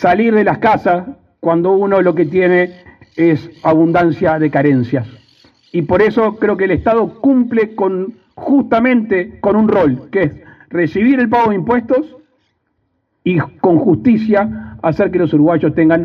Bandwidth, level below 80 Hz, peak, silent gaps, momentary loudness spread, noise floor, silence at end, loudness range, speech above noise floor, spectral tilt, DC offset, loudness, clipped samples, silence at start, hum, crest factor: 6.2 kHz; -46 dBFS; 0 dBFS; none; 9 LU; -65 dBFS; 0 s; 2 LU; 52 dB; -9.5 dB/octave; under 0.1%; -14 LUFS; under 0.1%; 0 s; none; 12 dB